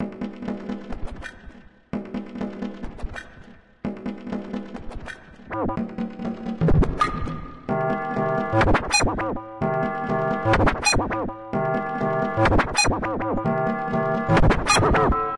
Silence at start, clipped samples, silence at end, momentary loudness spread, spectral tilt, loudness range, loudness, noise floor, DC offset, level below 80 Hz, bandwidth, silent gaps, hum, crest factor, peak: 0 s; under 0.1%; 0 s; 16 LU; -5 dB/octave; 12 LU; -23 LUFS; -47 dBFS; 0.3%; -34 dBFS; 11.5 kHz; none; none; 16 dB; -8 dBFS